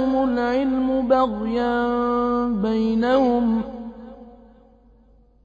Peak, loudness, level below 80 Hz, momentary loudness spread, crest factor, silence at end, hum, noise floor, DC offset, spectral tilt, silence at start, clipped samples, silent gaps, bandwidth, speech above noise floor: -6 dBFS; -21 LUFS; -46 dBFS; 14 LU; 16 dB; 1.1 s; none; -54 dBFS; under 0.1%; -7.5 dB/octave; 0 s; under 0.1%; none; 7 kHz; 34 dB